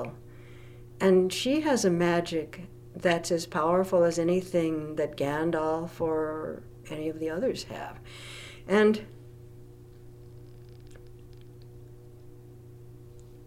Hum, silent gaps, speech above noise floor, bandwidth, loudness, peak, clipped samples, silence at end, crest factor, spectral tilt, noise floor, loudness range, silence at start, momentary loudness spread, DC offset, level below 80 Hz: none; none; 21 dB; 15.5 kHz; -27 LUFS; -12 dBFS; under 0.1%; 0 s; 18 dB; -5.5 dB/octave; -48 dBFS; 6 LU; 0 s; 26 LU; under 0.1%; -56 dBFS